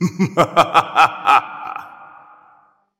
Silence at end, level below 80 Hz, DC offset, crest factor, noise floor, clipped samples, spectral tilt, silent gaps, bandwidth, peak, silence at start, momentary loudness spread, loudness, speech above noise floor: 0.95 s; -56 dBFS; under 0.1%; 18 dB; -54 dBFS; under 0.1%; -5 dB/octave; none; 16.5 kHz; 0 dBFS; 0 s; 17 LU; -15 LUFS; 40 dB